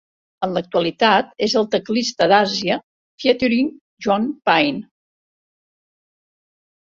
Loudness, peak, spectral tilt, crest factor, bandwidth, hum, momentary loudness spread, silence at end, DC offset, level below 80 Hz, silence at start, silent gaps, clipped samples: -19 LUFS; -2 dBFS; -4.5 dB/octave; 18 dB; 7.6 kHz; none; 9 LU; 2.1 s; under 0.1%; -60 dBFS; 0.4 s; 2.84-3.18 s, 3.81-3.97 s; under 0.1%